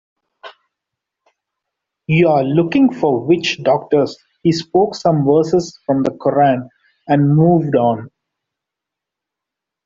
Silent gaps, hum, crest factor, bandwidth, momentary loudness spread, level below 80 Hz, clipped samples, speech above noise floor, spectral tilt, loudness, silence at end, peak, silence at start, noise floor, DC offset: none; none; 16 dB; 7.6 kHz; 6 LU; -54 dBFS; under 0.1%; 69 dB; -7 dB/octave; -15 LUFS; 1.8 s; -2 dBFS; 0.45 s; -83 dBFS; under 0.1%